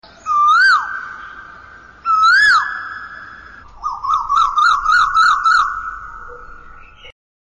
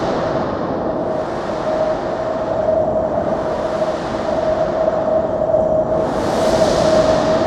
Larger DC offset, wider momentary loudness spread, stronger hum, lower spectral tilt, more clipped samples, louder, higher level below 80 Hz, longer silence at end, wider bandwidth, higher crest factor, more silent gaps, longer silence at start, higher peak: neither; first, 23 LU vs 7 LU; neither; second, 0.5 dB/octave vs -6 dB/octave; neither; first, -13 LUFS vs -18 LUFS; about the same, -44 dBFS vs -40 dBFS; first, 0.4 s vs 0 s; about the same, 11 kHz vs 12 kHz; about the same, 10 dB vs 14 dB; neither; first, 0.25 s vs 0 s; second, -6 dBFS vs -2 dBFS